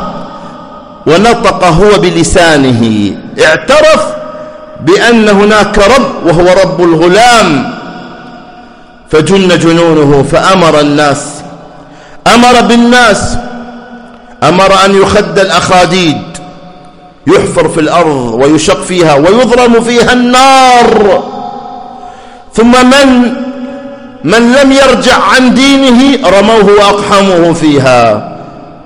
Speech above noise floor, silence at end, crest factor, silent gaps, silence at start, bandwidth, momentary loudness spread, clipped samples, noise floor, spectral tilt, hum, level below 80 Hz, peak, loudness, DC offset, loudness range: 28 dB; 0.15 s; 6 dB; none; 0 s; 16 kHz; 18 LU; 3%; -32 dBFS; -4.5 dB/octave; none; -28 dBFS; 0 dBFS; -5 LUFS; under 0.1%; 3 LU